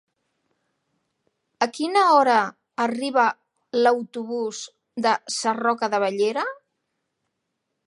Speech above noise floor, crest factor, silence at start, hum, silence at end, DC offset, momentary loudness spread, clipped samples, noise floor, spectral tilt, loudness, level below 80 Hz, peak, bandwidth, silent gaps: 57 dB; 20 dB; 1.6 s; none; 1.35 s; under 0.1%; 13 LU; under 0.1%; -79 dBFS; -3 dB/octave; -22 LUFS; -82 dBFS; -4 dBFS; 11 kHz; none